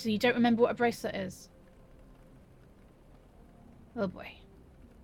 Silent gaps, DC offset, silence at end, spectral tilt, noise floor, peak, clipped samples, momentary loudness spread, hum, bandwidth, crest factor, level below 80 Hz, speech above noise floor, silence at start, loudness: none; under 0.1%; 0.7 s; -5.5 dB/octave; -57 dBFS; -12 dBFS; under 0.1%; 22 LU; none; 16.5 kHz; 22 dB; -60 dBFS; 27 dB; 0 s; -30 LUFS